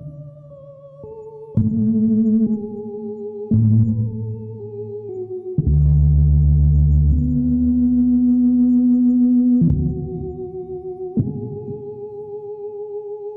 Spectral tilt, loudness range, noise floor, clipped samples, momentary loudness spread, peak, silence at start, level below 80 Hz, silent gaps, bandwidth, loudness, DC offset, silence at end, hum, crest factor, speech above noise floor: -15 dB/octave; 7 LU; -40 dBFS; under 0.1%; 16 LU; -6 dBFS; 0 s; -26 dBFS; none; 1.3 kHz; -17 LUFS; under 0.1%; 0 s; none; 12 dB; 23 dB